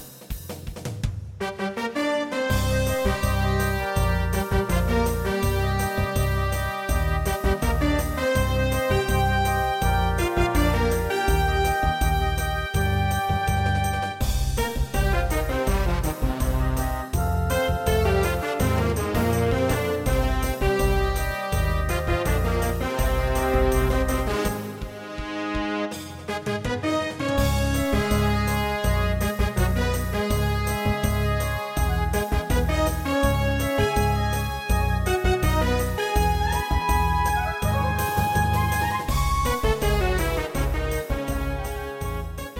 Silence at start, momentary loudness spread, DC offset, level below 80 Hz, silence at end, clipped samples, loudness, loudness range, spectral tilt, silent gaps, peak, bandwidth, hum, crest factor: 0 s; 6 LU; under 0.1%; -28 dBFS; 0 s; under 0.1%; -24 LUFS; 2 LU; -5.5 dB/octave; none; -8 dBFS; 17 kHz; none; 16 dB